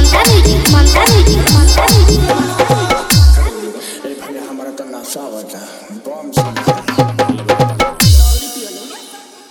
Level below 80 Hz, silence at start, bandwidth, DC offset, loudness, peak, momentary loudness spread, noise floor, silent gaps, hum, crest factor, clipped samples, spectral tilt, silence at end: -14 dBFS; 0 s; 19.5 kHz; under 0.1%; -10 LUFS; 0 dBFS; 18 LU; -35 dBFS; none; none; 12 dB; under 0.1%; -4.5 dB/octave; 0.3 s